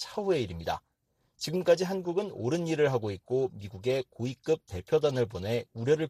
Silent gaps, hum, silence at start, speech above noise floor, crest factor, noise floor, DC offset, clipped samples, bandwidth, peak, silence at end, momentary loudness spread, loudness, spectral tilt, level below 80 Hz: none; none; 0 s; 45 dB; 18 dB; -75 dBFS; under 0.1%; under 0.1%; 15 kHz; -12 dBFS; 0 s; 9 LU; -30 LUFS; -6 dB/octave; -60 dBFS